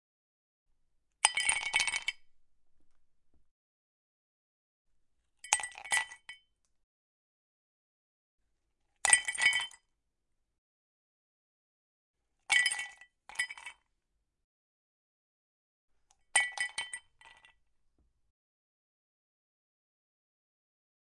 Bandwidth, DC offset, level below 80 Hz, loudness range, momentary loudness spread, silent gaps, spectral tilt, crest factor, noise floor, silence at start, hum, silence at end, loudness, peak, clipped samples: 11.5 kHz; under 0.1%; -74 dBFS; 10 LU; 17 LU; 3.51-4.85 s, 6.83-8.38 s, 10.58-12.14 s, 14.44-15.88 s; 3 dB/octave; 34 dB; -82 dBFS; 1.25 s; none; 4.2 s; -30 LUFS; -6 dBFS; under 0.1%